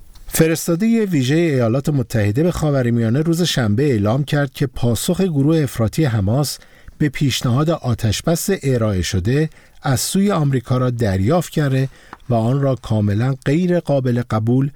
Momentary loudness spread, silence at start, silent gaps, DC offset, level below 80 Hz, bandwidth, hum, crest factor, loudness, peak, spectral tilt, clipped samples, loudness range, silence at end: 4 LU; 0 s; none; 0.2%; -40 dBFS; 20 kHz; none; 16 dB; -18 LUFS; -2 dBFS; -6 dB/octave; under 0.1%; 2 LU; 0.05 s